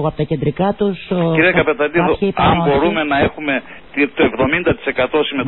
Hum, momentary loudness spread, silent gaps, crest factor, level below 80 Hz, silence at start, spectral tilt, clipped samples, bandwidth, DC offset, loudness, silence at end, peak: none; 6 LU; none; 14 dB; -38 dBFS; 0 s; -11.5 dB/octave; under 0.1%; 4.2 kHz; 0.7%; -16 LUFS; 0 s; -2 dBFS